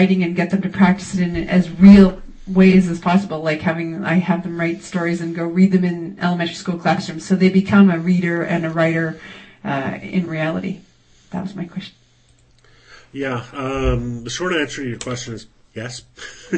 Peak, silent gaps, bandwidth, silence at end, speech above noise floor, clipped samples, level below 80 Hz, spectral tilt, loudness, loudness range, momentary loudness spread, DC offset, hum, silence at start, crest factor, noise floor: 0 dBFS; none; 8.6 kHz; 0 s; 37 dB; under 0.1%; -38 dBFS; -7 dB/octave; -17 LUFS; 12 LU; 19 LU; under 0.1%; none; 0 s; 18 dB; -54 dBFS